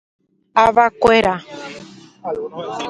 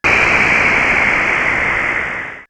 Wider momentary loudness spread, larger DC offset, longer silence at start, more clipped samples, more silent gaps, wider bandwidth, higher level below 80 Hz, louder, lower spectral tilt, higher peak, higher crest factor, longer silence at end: first, 19 LU vs 6 LU; neither; first, 0.55 s vs 0.05 s; neither; neither; second, 11.5 kHz vs 15 kHz; second, -48 dBFS vs -36 dBFS; second, -16 LUFS vs -12 LUFS; about the same, -4.5 dB/octave vs -3.5 dB/octave; about the same, 0 dBFS vs 0 dBFS; about the same, 18 dB vs 14 dB; about the same, 0 s vs 0.05 s